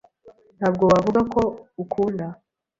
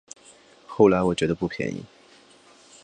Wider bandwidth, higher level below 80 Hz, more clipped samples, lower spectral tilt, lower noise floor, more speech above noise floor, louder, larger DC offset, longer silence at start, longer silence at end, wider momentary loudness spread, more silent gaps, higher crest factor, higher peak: second, 7.8 kHz vs 9.6 kHz; about the same, -50 dBFS vs -52 dBFS; neither; first, -7.5 dB/octave vs -6 dB/octave; about the same, -52 dBFS vs -54 dBFS; about the same, 31 dB vs 32 dB; about the same, -22 LUFS vs -23 LUFS; neither; second, 0.25 s vs 0.7 s; second, 0.45 s vs 1 s; second, 14 LU vs 24 LU; neither; about the same, 18 dB vs 20 dB; about the same, -4 dBFS vs -4 dBFS